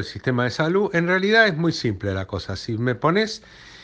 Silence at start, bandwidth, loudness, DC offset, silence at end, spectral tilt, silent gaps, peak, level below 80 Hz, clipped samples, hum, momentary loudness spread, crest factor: 0 s; 9.2 kHz; -21 LUFS; under 0.1%; 0 s; -6 dB/octave; none; -4 dBFS; -52 dBFS; under 0.1%; none; 12 LU; 18 dB